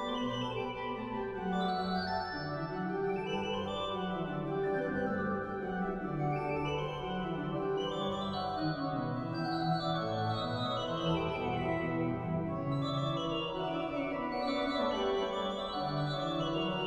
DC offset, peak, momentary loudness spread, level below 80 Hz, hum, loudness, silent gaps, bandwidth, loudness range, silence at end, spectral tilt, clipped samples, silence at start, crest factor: under 0.1%; -20 dBFS; 4 LU; -56 dBFS; none; -35 LUFS; none; 9.4 kHz; 1 LU; 0 s; -7 dB/octave; under 0.1%; 0 s; 14 dB